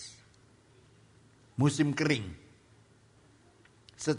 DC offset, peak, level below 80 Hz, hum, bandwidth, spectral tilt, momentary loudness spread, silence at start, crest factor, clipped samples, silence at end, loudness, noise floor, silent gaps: under 0.1%; -14 dBFS; -64 dBFS; none; 10.5 kHz; -5.5 dB/octave; 20 LU; 0 s; 22 dB; under 0.1%; 0 s; -30 LUFS; -62 dBFS; none